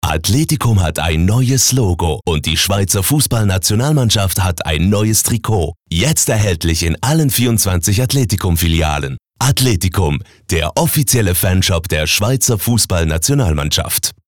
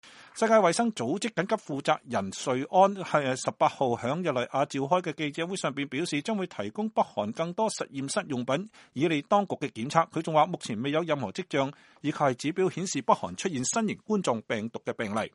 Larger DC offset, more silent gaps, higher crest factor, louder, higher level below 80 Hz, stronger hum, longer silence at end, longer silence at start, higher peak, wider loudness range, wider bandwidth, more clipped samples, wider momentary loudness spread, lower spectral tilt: first, 0.7% vs under 0.1%; neither; second, 10 dB vs 22 dB; first, -14 LUFS vs -28 LUFS; first, -30 dBFS vs -72 dBFS; neither; about the same, 0.15 s vs 0.05 s; about the same, 0.05 s vs 0.05 s; about the same, -4 dBFS vs -6 dBFS; about the same, 1 LU vs 3 LU; first, over 20 kHz vs 11.5 kHz; neither; second, 5 LU vs 8 LU; about the same, -4 dB/octave vs -4.5 dB/octave